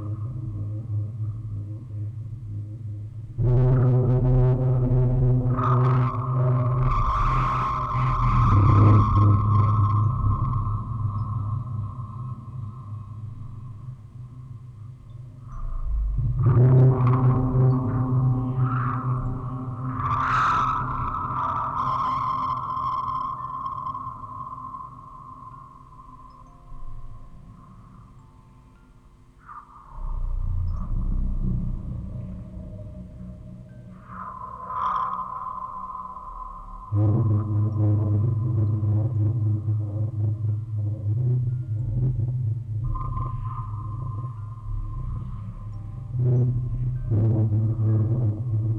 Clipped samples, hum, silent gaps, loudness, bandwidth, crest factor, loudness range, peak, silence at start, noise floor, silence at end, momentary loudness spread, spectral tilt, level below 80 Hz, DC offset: under 0.1%; none; none; -24 LUFS; 5.6 kHz; 18 dB; 15 LU; -6 dBFS; 0 s; -51 dBFS; 0 s; 20 LU; -10 dB/octave; -34 dBFS; under 0.1%